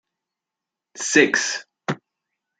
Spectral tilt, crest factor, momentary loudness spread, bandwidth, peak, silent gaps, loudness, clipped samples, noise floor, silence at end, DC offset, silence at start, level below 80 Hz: -2.5 dB/octave; 24 dB; 14 LU; 9.6 kHz; -2 dBFS; none; -20 LUFS; under 0.1%; -86 dBFS; 0.65 s; under 0.1%; 0.95 s; -74 dBFS